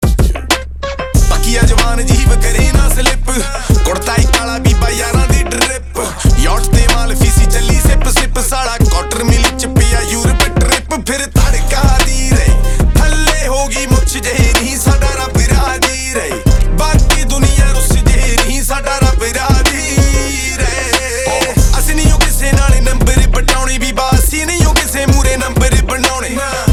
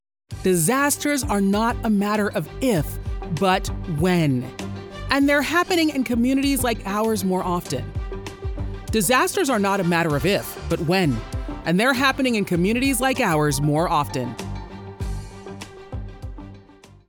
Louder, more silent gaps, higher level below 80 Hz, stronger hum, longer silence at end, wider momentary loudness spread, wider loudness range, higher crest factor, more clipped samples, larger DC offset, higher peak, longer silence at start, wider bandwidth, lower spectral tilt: first, -12 LUFS vs -21 LUFS; neither; first, -12 dBFS vs -36 dBFS; neither; second, 0 s vs 0.45 s; second, 4 LU vs 15 LU; about the same, 1 LU vs 3 LU; second, 10 dB vs 18 dB; neither; neither; first, 0 dBFS vs -4 dBFS; second, 0 s vs 0.3 s; second, 16.5 kHz vs over 20 kHz; about the same, -4 dB/octave vs -5 dB/octave